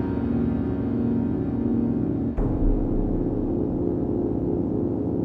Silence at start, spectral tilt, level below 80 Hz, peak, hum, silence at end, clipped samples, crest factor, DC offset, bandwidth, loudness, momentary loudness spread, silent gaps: 0 s; -12 dB/octave; -32 dBFS; -10 dBFS; 60 Hz at -50 dBFS; 0 s; under 0.1%; 12 dB; under 0.1%; 4.3 kHz; -25 LUFS; 2 LU; none